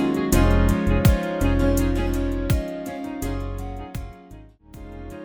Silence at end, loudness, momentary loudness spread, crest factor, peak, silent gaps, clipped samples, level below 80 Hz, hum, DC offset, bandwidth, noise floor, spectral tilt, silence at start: 0 s; -23 LUFS; 18 LU; 18 dB; -4 dBFS; none; under 0.1%; -26 dBFS; none; under 0.1%; over 20 kHz; -44 dBFS; -6.5 dB/octave; 0 s